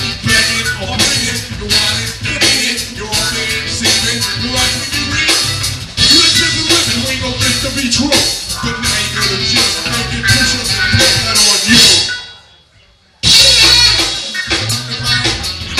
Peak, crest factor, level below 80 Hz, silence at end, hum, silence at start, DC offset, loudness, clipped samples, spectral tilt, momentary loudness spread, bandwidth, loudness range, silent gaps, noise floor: 0 dBFS; 12 dB; -32 dBFS; 0 s; none; 0 s; under 0.1%; -10 LUFS; 0.2%; -1.5 dB/octave; 11 LU; over 20 kHz; 5 LU; none; -48 dBFS